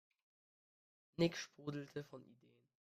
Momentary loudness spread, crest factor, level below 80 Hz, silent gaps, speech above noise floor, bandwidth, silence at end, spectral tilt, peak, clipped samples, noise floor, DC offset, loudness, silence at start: 18 LU; 24 dB; -80 dBFS; none; over 47 dB; 14.5 kHz; 0.6 s; -5.5 dB/octave; -24 dBFS; under 0.1%; under -90 dBFS; under 0.1%; -43 LUFS; 1.2 s